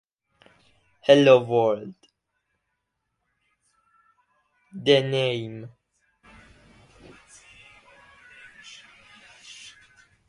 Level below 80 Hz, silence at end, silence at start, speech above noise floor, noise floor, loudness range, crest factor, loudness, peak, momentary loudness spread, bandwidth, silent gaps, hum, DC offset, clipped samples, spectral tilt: -68 dBFS; 4.6 s; 1.1 s; 59 dB; -79 dBFS; 24 LU; 24 dB; -20 LUFS; -4 dBFS; 29 LU; 11 kHz; none; none; under 0.1%; under 0.1%; -5.5 dB/octave